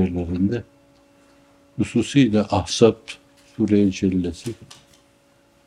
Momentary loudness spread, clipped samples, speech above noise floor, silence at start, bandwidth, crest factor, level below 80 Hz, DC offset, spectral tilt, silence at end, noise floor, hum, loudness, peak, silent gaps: 19 LU; under 0.1%; 37 dB; 0 s; 11.5 kHz; 22 dB; -52 dBFS; under 0.1%; -6 dB/octave; 1.15 s; -57 dBFS; none; -20 LUFS; 0 dBFS; none